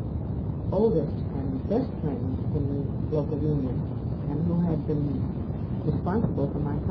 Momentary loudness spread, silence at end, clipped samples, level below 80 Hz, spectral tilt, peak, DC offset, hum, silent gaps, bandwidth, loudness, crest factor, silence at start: 6 LU; 0 s; under 0.1%; -38 dBFS; -12.5 dB/octave; -12 dBFS; under 0.1%; none; none; 5.4 kHz; -28 LUFS; 14 dB; 0 s